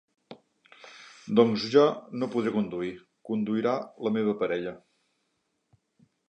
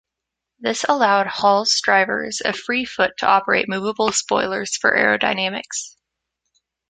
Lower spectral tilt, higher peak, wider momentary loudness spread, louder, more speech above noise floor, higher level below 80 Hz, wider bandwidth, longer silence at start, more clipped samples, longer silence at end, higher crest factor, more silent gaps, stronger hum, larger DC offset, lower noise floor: first, -6.5 dB/octave vs -2 dB/octave; second, -8 dBFS vs 0 dBFS; first, 23 LU vs 8 LU; second, -27 LUFS vs -19 LUFS; second, 50 dB vs 64 dB; second, -72 dBFS vs -60 dBFS; second, 8.2 kHz vs 9.6 kHz; second, 0.3 s vs 0.6 s; neither; first, 1.55 s vs 1 s; about the same, 22 dB vs 20 dB; neither; neither; neither; second, -77 dBFS vs -83 dBFS